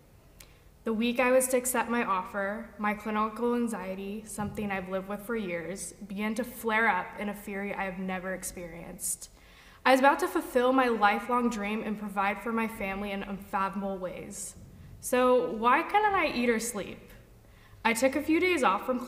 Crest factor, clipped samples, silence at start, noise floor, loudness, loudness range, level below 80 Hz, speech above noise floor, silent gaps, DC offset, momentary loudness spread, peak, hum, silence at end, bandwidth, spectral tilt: 20 dB; under 0.1%; 0.4 s; -55 dBFS; -29 LUFS; 6 LU; -58 dBFS; 26 dB; none; under 0.1%; 13 LU; -10 dBFS; none; 0 s; 16 kHz; -4 dB/octave